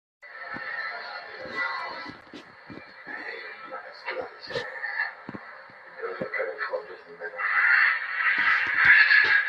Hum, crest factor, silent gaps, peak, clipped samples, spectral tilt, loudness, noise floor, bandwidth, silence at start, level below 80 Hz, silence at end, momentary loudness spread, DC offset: none; 22 dB; none; -6 dBFS; under 0.1%; -3.5 dB/octave; -23 LUFS; -47 dBFS; 7.8 kHz; 0.25 s; -70 dBFS; 0 s; 26 LU; under 0.1%